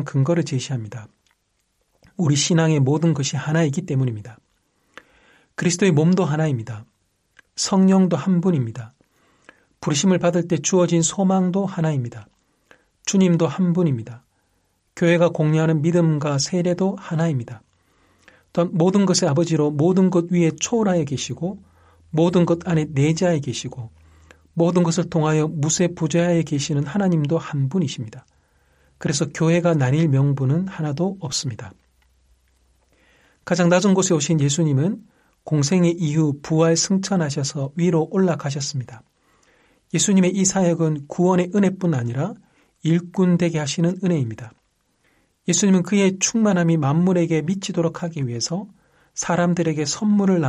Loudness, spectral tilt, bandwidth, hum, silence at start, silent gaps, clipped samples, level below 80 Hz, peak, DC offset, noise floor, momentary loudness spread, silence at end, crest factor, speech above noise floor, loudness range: -20 LUFS; -5.5 dB/octave; 11 kHz; none; 0 s; none; under 0.1%; -60 dBFS; -4 dBFS; under 0.1%; -69 dBFS; 11 LU; 0 s; 16 dB; 50 dB; 3 LU